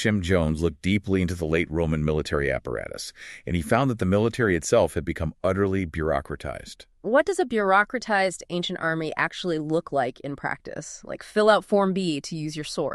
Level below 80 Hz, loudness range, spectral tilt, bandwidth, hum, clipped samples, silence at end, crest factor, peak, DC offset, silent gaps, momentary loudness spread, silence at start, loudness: -42 dBFS; 2 LU; -5.5 dB/octave; 13 kHz; none; under 0.1%; 0 s; 20 dB; -6 dBFS; under 0.1%; none; 13 LU; 0 s; -25 LUFS